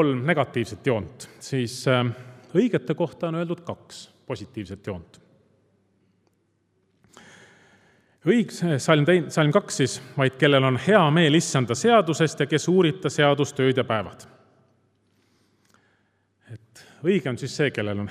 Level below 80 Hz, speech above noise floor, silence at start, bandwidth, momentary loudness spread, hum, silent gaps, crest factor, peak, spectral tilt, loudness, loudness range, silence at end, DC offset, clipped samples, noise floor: -68 dBFS; 46 dB; 0 s; 14 kHz; 17 LU; none; none; 22 dB; -2 dBFS; -5.5 dB/octave; -22 LUFS; 17 LU; 0 s; under 0.1%; under 0.1%; -69 dBFS